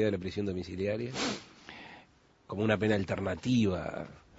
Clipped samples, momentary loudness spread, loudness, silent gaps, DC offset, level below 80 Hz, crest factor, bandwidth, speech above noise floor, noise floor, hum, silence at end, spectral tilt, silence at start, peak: under 0.1%; 19 LU; -32 LUFS; none; under 0.1%; -58 dBFS; 22 dB; 8 kHz; 30 dB; -62 dBFS; none; 0.2 s; -6 dB/octave; 0 s; -12 dBFS